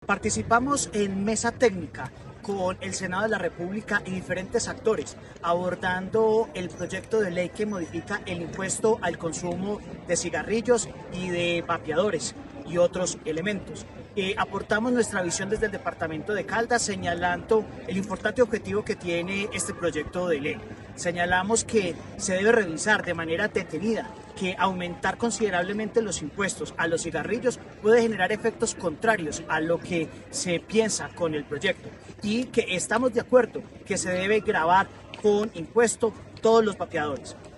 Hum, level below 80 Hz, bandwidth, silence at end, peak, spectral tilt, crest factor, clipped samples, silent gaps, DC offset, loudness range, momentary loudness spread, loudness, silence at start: none; -52 dBFS; 12 kHz; 0 s; -8 dBFS; -4 dB/octave; 18 dB; under 0.1%; none; under 0.1%; 4 LU; 9 LU; -26 LUFS; 0 s